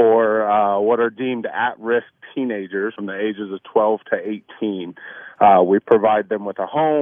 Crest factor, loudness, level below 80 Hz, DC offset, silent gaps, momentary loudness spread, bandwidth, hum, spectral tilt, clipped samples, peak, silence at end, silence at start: 18 dB; -19 LUFS; -64 dBFS; under 0.1%; none; 13 LU; 3.7 kHz; none; -9.5 dB/octave; under 0.1%; 0 dBFS; 0 s; 0 s